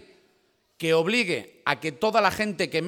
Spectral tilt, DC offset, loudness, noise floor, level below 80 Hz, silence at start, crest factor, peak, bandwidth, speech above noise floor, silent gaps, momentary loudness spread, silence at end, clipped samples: -4.5 dB/octave; under 0.1%; -24 LUFS; -67 dBFS; -62 dBFS; 0.8 s; 22 dB; -4 dBFS; 18 kHz; 42 dB; none; 7 LU; 0 s; under 0.1%